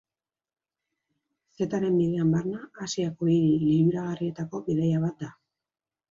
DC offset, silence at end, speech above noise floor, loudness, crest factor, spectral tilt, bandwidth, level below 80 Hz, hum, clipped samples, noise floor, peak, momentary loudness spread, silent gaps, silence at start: under 0.1%; 0.8 s; over 65 dB; -26 LUFS; 14 dB; -7.5 dB/octave; 7.6 kHz; -64 dBFS; none; under 0.1%; under -90 dBFS; -12 dBFS; 11 LU; none; 1.6 s